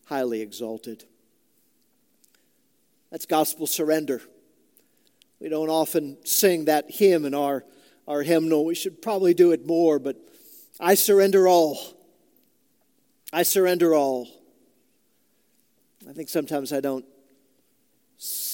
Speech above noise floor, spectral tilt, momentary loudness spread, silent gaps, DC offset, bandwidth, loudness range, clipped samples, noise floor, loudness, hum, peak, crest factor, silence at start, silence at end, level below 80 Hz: 46 dB; -4 dB/octave; 19 LU; none; under 0.1%; 17 kHz; 12 LU; under 0.1%; -68 dBFS; -22 LUFS; none; -6 dBFS; 20 dB; 0.1 s; 0 s; -80 dBFS